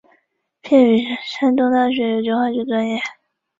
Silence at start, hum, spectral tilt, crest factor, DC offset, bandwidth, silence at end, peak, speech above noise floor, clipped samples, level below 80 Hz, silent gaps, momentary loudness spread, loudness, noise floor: 0.65 s; none; -6 dB/octave; 16 dB; under 0.1%; 7.6 kHz; 0.5 s; -2 dBFS; 47 dB; under 0.1%; -64 dBFS; none; 10 LU; -17 LUFS; -64 dBFS